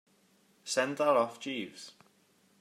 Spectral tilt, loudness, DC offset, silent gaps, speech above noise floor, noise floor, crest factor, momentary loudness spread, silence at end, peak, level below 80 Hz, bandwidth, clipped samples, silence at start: -3 dB/octave; -31 LUFS; under 0.1%; none; 36 dB; -68 dBFS; 20 dB; 21 LU; 0.7 s; -14 dBFS; -90 dBFS; 15.5 kHz; under 0.1%; 0.65 s